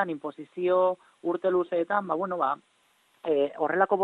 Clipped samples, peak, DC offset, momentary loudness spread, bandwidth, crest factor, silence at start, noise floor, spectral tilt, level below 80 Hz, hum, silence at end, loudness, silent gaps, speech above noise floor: under 0.1%; -8 dBFS; under 0.1%; 11 LU; 4.2 kHz; 20 dB; 0 s; -66 dBFS; -7.5 dB/octave; -74 dBFS; none; 0 s; -28 LUFS; none; 39 dB